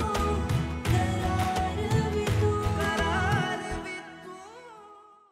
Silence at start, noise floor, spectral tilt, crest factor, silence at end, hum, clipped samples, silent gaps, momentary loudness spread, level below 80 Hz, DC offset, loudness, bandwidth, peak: 0 s; -52 dBFS; -6 dB/octave; 16 dB; 0.3 s; none; under 0.1%; none; 18 LU; -38 dBFS; under 0.1%; -28 LUFS; 15.5 kHz; -12 dBFS